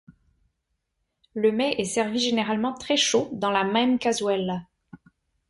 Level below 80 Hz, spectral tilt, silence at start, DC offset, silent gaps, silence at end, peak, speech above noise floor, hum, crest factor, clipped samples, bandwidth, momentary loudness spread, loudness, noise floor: -64 dBFS; -3.5 dB/octave; 0.1 s; under 0.1%; none; 0.55 s; -8 dBFS; 54 dB; none; 18 dB; under 0.1%; 11.5 kHz; 6 LU; -24 LUFS; -78 dBFS